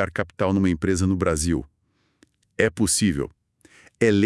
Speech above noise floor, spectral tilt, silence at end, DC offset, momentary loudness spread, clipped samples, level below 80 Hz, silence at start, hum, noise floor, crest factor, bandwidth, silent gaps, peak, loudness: 47 dB; -5 dB/octave; 0 s; under 0.1%; 9 LU; under 0.1%; -44 dBFS; 0 s; none; -68 dBFS; 22 dB; 12 kHz; none; -2 dBFS; -23 LUFS